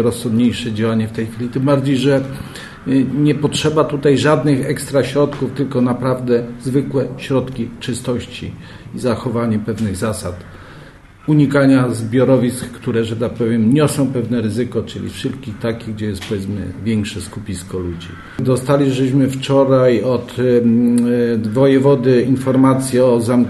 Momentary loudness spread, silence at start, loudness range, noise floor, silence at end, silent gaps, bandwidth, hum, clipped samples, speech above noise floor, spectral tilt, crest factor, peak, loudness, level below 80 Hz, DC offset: 12 LU; 0 s; 8 LU; -39 dBFS; 0 s; none; 12.5 kHz; none; under 0.1%; 24 dB; -6.5 dB/octave; 14 dB; -2 dBFS; -16 LUFS; -46 dBFS; under 0.1%